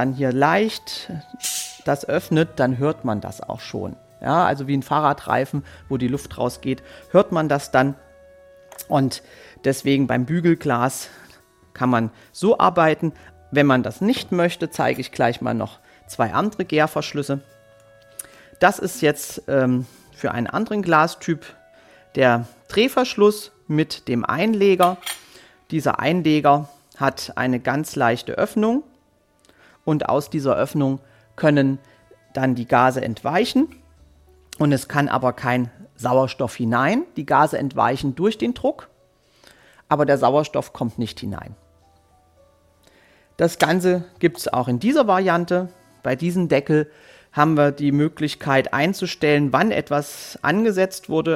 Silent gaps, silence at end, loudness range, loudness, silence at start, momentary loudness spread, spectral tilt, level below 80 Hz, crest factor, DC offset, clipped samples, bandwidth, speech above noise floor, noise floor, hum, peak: none; 0 s; 4 LU; -21 LUFS; 0 s; 12 LU; -6 dB/octave; -56 dBFS; 20 dB; under 0.1%; under 0.1%; 16.5 kHz; 40 dB; -60 dBFS; none; -2 dBFS